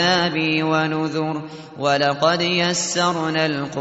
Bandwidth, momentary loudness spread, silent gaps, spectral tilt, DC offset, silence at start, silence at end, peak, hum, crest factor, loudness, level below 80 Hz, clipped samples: 8.2 kHz; 7 LU; none; -4 dB/octave; under 0.1%; 0 s; 0 s; -4 dBFS; none; 18 dB; -20 LUFS; -60 dBFS; under 0.1%